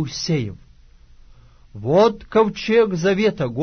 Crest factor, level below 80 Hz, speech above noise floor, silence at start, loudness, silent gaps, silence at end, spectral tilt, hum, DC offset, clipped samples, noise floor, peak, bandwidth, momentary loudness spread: 16 dB; -48 dBFS; 29 dB; 0 s; -19 LUFS; none; 0 s; -6 dB/octave; none; under 0.1%; under 0.1%; -48 dBFS; -4 dBFS; 6.6 kHz; 7 LU